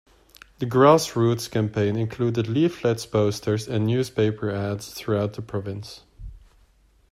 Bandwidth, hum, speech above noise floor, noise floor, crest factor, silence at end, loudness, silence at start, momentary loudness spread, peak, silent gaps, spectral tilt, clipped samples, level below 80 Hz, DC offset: 15 kHz; none; 36 dB; -59 dBFS; 20 dB; 0.75 s; -23 LUFS; 0.6 s; 13 LU; -4 dBFS; none; -6.5 dB/octave; under 0.1%; -52 dBFS; under 0.1%